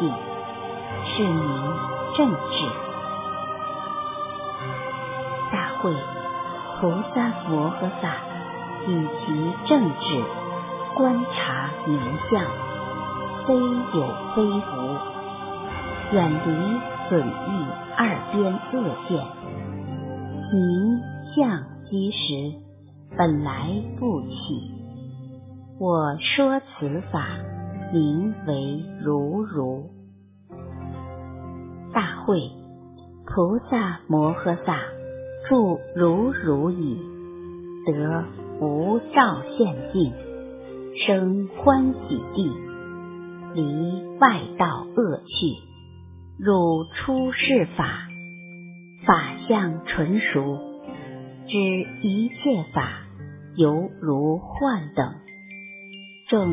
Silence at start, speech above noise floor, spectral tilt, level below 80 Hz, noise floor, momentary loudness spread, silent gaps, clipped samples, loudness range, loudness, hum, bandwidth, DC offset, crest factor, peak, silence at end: 0 s; 26 dB; -10.5 dB/octave; -50 dBFS; -49 dBFS; 17 LU; none; under 0.1%; 4 LU; -24 LUFS; none; 3.9 kHz; under 0.1%; 22 dB; -2 dBFS; 0 s